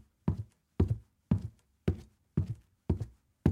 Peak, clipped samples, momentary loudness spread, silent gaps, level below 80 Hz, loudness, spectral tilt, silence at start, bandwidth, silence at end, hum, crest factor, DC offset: -12 dBFS; under 0.1%; 11 LU; none; -48 dBFS; -36 LUFS; -10 dB/octave; 0.25 s; 9.8 kHz; 0 s; none; 22 dB; under 0.1%